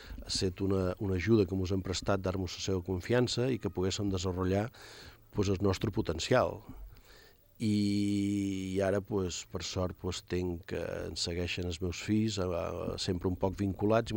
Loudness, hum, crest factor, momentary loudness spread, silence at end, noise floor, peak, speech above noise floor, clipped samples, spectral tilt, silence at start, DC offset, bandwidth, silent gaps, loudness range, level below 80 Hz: -33 LUFS; none; 18 dB; 8 LU; 0 s; -58 dBFS; -14 dBFS; 26 dB; under 0.1%; -5.5 dB/octave; 0 s; under 0.1%; 16.5 kHz; none; 3 LU; -54 dBFS